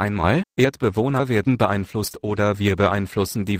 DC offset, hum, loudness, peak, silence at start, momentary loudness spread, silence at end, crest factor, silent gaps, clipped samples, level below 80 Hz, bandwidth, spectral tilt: under 0.1%; none; -21 LUFS; -4 dBFS; 0 s; 5 LU; 0 s; 18 dB; none; under 0.1%; -44 dBFS; 16 kHz; -6.5 dB/octave